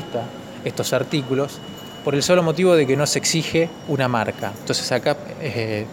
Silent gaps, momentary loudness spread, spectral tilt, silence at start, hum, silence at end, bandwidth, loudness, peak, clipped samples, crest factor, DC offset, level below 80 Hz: none; 12 LU; -4.5 dB/octave; 0 s; none; 0 s; 17 kHz; -21 LUFS; -4 dBFS; under 0.1%; 18 dB; under 0.1%; -58 dBFS